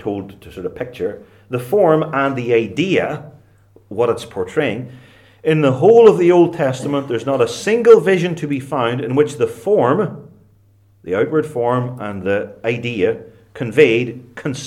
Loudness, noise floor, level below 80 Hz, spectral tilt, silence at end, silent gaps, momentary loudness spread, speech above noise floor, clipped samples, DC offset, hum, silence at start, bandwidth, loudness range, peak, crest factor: -16 LUFS; -52 dBFS; -58 dBFS; -6.5 dB/octave; 0 s; none; 16 LU; 36 dB; under 0.1%; under 0.1%; none; 0 s; 13 kHz; 7 LU; 0 dBFS; 16 dB